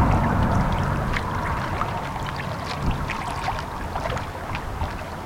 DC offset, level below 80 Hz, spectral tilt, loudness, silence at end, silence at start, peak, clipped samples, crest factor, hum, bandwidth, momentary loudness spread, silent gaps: under 0.1%; -32 dBFS; -6.5 dB/octave; -26 LUFS; 0 s; 0 s; -8 dBFS; under 0.1%; 18 dB; none; 17 kHz; 9 LU; none